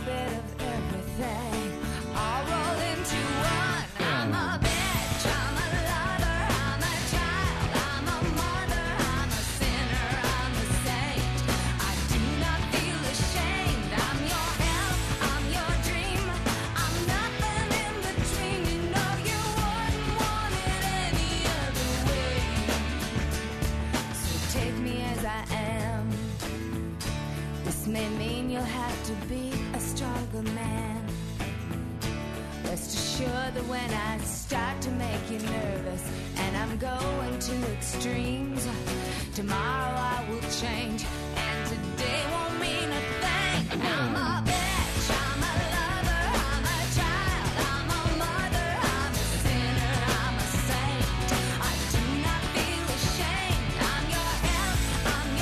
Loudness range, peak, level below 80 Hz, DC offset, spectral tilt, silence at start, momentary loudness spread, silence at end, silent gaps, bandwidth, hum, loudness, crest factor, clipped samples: 4 LU; -16 dBFS; -36 dBFS; under 0.1%; -4 dB/octave; 0 s; 6 LU; 0 s; none; 13.5 kHz; none; -29 LUFS; 14 dB; under 0.1%